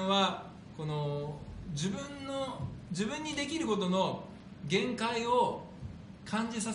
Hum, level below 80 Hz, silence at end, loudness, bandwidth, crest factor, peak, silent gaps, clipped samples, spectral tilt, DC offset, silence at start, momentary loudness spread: none; -58 dBFS; 0 s; -34 LUFS; 10.5 kHz; 18 dB; -16 dBFS; none; under 0.1%; -4.5 dB/octave; under 0.1%; 0 s; 16 LU